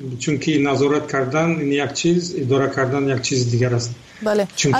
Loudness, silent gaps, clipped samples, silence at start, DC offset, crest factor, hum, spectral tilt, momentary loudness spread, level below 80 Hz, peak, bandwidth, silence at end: -19 LUFS; none; under 0.1%; 0 s; under 0.1%; 12 dB; none; -5 dB/octave; 3 LU; -54 dBFS; -8 dBFS; 12 kHz; 0 s